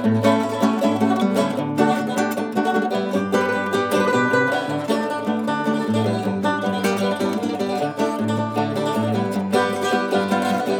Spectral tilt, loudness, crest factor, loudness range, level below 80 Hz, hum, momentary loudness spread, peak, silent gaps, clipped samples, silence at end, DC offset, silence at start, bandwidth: -5.5 dB/octave; -21 LUFS; 16 dB; 2 LU; -72 dBFS; none; 4 LU; -4 dBFS; none; under 0.1%; 0 s; under 0.1%; 0 s; 19 kHz